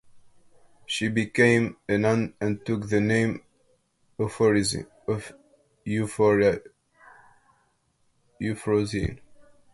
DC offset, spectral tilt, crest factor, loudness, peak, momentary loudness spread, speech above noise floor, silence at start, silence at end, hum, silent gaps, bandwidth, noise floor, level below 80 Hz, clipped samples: under 0.1%; -5.5 dB/octave; 20 dB; -25 LUFS; -6 dBFS; 13 LU; 45 dB; 0.15 s; 0.55 s; none; none; 11.5 kHz; -69 dBFS; -50 dBFS; under 0.1%